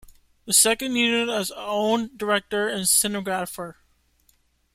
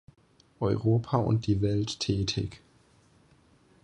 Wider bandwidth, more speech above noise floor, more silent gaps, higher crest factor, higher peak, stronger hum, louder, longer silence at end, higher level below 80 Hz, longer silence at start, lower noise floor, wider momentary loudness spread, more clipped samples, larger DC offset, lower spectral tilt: first, 16.5 kHz vs 9.6 kHz; first, 41 dB vs 35 dB; neither; about the same, 22 dB vs 20 dB; first, -2 dBFS vs -10 dBFS; neither; first, -22 LUFS vs -28 LUFS; second, 1.05 s vs 1.25 s; second, -58 dBFS vs -50 dBFS; second, 0.45 s vs 0.6 s; about the same, -64 dBFS vs -62 dBFS; first, 11 LU vs 7 LU; neither; neither; second, -1.5 dB/octave vs -6.5 dB/octave